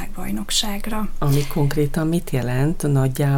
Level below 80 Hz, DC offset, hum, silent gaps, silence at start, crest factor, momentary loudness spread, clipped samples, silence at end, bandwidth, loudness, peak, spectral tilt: -28 dBFS; under 0.1%; none; none; 0 s; 14 dB; 7 LU; under 0.1%; 0 s; 17 kHz; -21 LUFS; -6 dBFS; -5.5 dB/octave